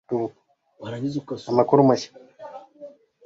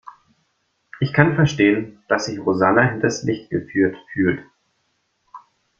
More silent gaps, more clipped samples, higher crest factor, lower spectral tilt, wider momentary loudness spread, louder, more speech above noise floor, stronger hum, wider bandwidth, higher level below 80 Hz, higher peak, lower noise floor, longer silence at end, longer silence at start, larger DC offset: neither; neither; about the same, 22 dB vs 20 dB; about the same, -7 dB/octave vs -6.5 dB/octave; first, 24 LU vs 9 LU; second, -22 LUFS vs -19 LUFS; second, 24 dB vs 50 dB; neither; about the same, 7.8 kHz vs 7.6 kHz; second, -66 dBFS vs -54 dBFS; about the same, -2 dBFS vs -2 dBFS; second, -45 dBFS vs -69 dBFS; about the same, 0.35 s vs 0.4 s; about the same, 0.1 s vs 0.05 s; neither